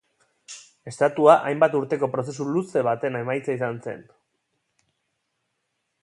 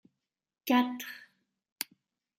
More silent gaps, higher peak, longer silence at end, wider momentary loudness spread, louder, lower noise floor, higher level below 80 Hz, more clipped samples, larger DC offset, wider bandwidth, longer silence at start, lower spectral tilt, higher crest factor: neither; first, -2 dBFS vs -12 dBFS; first, 2 s vs 1.15 s; first, 23 LU vs 16 LU; first, -22 LUFS vs -32 LUFS; second, -77 dBFS vs -85 dBFS; first, -72 dBFS vs under -90 dBFS; neither; neither; second, 11 kHz vs 16 kHz; second, 0.5 s vs 0.65 s; first, -6.5 dB/octave vs -2.5 dB/octave; about the same, 22 dB vs 22 dB